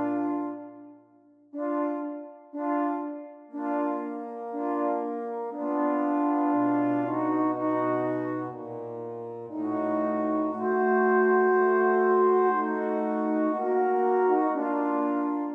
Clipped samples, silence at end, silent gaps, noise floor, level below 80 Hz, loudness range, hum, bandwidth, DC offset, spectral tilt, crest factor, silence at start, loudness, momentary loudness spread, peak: under 0.1%; 0 s; none; -58 dBFS; -86 dBFS; 8 LU; none; 3.9 kHz; under 0.1%; -9.5 dB/octave; 14 dB; 0 s; -27 LUFS; 14 LU; -12 dBFS